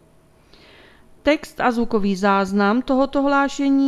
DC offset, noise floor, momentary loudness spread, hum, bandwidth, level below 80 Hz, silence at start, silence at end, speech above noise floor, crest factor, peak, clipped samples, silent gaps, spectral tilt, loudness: under 0.1%; -53 dBFS; 3 LU; none; 13 kHz; -46 dBFS; 1.25 s; 0 s; 35 dB; 18 dB; -2 dBFS; under 0.1%; none; -6 dB/octave; -19 LUFS